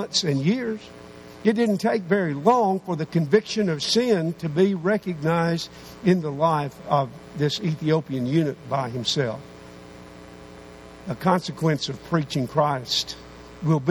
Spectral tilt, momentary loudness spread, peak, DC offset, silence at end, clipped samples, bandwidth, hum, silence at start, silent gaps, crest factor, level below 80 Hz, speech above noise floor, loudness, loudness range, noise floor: -5.5 dB/octave; 22 LU; -4 dBFS; under 0.1%; 0 s; under 0.1%; 19 kHz; none; 0 s; none; 20 dB; -56 dBFS; 20 dB; -23 LUFS; 6 LU; -43 dBFS